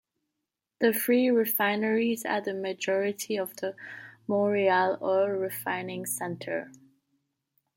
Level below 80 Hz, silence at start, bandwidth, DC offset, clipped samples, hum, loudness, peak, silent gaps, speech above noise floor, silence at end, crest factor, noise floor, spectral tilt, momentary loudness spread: -78 dBFS; 0.8 s; 17 kHz; under 0.1%; under 0.1%; none; -28 LUFS; -12 dBFS; none; 58 dB; 1.05 s; 18 dB; -85 dBFS; -4 dB/octave; 12 LU